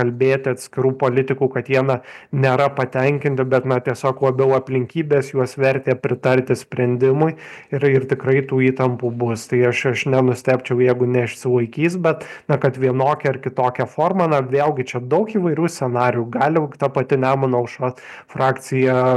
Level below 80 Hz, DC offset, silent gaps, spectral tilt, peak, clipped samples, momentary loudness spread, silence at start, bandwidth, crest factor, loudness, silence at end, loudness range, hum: -62 dBFS; under 0.1%; none; -7 dB/octave; -2 dBFS; under 0.1%; 5 LU; 0 s; 12.5 kHz; 16 dB; -19 LUFS; 0 s; 1 LU; none